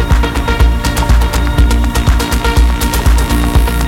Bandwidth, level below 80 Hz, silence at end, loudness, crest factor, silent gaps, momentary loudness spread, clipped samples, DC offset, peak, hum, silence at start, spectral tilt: 17 kHz; -12 dBFS; 0 s; -12 LUFS; 10 dB; none; 1 LU; under 0.1%; under 0.1%; 0 dBFS; none; 0 s; -5 dB/octave